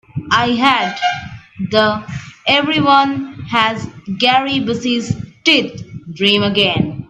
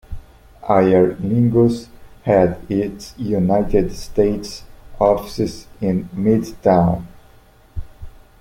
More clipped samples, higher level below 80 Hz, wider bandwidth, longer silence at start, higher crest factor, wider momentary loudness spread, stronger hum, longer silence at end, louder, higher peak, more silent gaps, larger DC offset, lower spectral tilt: neither; second, -50 dBFS vs -36 dBFS; second, 12 kHz vs 16 kHz; about the same, 0.15 s vs 0.1 s; about the same, 16 dB vs 18 dB; second, 14 LU vs 18 LU; neither; second, 0.05 s vs 0.3 s; first, -15 LUFS vs -18 LUFS; about the same, 0 dBFS vs -2 dBFS; neither; neither; second, -4.5 dB/octave vs -8 dB/octave